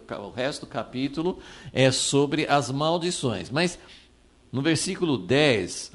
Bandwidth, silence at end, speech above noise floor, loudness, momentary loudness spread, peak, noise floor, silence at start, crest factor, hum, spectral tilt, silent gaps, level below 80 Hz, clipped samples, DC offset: 11.5 kHz; 0.05 s; 31 dB; -25 LUFS; 12 LU; -8 dBFS; -56 dBFS; 0.1 s; 18 dB; none; -4.5 dB/octave; none; -56 dBFS; under 0.1%; under 0.1%